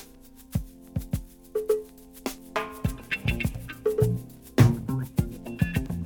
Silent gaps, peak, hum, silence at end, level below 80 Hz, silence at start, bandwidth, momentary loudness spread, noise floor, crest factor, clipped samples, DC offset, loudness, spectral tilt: none; -4 dBFS; none; 0 s; -42 dBFS; 0 s; over 20 kHz; 15 LU; -50 dBFS; 24 dB; under 0.1%; under 0.1%; -29 LUFS; -7 dB/octave